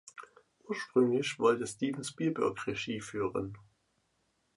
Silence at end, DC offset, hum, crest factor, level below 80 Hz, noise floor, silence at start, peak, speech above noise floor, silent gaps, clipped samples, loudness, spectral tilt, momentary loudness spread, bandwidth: 1 s; under 0.1%; none; 20 dB; -68 dBFS; -76 dBFS; 0.05 s; -14 dBFS; 44 dB; none; under 0.1%; -33 LUFS; -5 dB/octave; 12 LU; 11.5 kHz